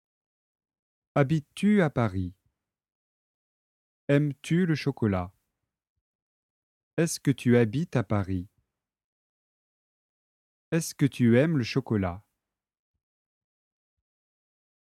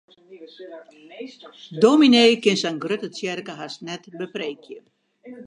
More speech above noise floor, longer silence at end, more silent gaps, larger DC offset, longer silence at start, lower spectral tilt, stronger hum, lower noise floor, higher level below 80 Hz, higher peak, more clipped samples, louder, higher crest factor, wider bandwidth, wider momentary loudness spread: first, 61 dB vs 21 dB; first, 2.65 s vs 0 s; first, 2.92-4.08 s, 5.89-6.97 s, 9.04-10.72 s vs none; neither; first, 1.15 s vs 0.3 s; first, -6.5 dB/octave vs -4.5 dB/octave; neither; first, -86 dBFS vs -43 dBFS; first, -60 dBFS vs -74 dBFS; second, -8 dBFS vs -2 dBFS; neither; second, -27 LUFS vs -19 LUFS; about the same, 22 dB vs 20 dB; first, 14.5 kHz vs 10.5 kHz; second, 12 LU vs 26 LU